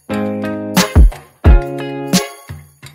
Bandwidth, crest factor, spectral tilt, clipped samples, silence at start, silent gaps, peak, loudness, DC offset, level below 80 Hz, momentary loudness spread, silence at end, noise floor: 16.5 kHz; 14 dB; -5 dB/octave; under 0.1%; 0.1 s; none; 0 dBFS; -15 LUFS; under 0.1%; -16 dBFS; 18 LU; 0.05 s; -34 dBFS